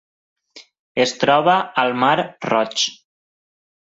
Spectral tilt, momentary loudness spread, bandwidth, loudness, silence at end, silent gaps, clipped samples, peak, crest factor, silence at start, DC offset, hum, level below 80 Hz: -3.5 dB/octave; 6 LU; 8 kHz; -18 LUFS; 1 s; 0.79-0.95 s; under 0.1%; -2 dBFS; 18 dB; 0.55 s; under 0.1%; none; -64 dBFS